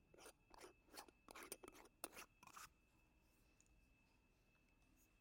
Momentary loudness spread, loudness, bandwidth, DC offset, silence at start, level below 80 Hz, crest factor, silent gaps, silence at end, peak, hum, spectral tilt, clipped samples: 9 LU; -60 LUFS; 16.5 kHz; under 0.1%; 0 s; -80 dBFS; 36 dB; none; 0 s; -30 dBFS; none; -2 dB/octave; under 0.1%